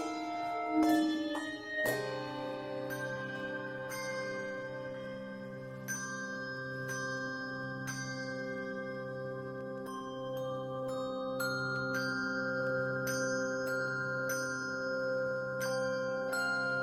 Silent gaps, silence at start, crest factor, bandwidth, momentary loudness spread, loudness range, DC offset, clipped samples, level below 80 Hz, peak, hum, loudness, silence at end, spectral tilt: none; 0 s; 18 dB; 16 kHz; 8 LU; 5 LU; under 0.1%; under 0.1%; -72 dBFS; -18 dBFS; none; -36 LUFS; 0 s; -4.5 dB/octave